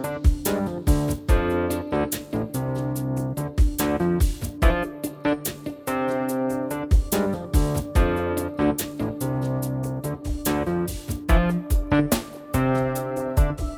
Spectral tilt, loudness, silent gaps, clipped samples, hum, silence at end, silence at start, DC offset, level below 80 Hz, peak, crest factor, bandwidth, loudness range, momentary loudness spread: -6 dB/octave; -25 LUFS; none; under 0.1%; none; 0 s; 0 s; under 0.1%; -28 dBFS; -4 dBFS; 18 dB; over 20 kHz; 1 LU; 6 LU